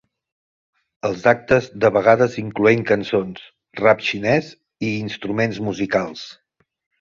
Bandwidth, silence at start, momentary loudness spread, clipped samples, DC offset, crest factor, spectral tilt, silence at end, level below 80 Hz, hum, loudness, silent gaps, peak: 7.4 kHz; 1.05 s; 15 LU; under 0.1%; under 0.1%; 20 dB; -6 dB/octave; 0.7 s; -54 dBFS; none; -19 LUFS; none; 0 dBFS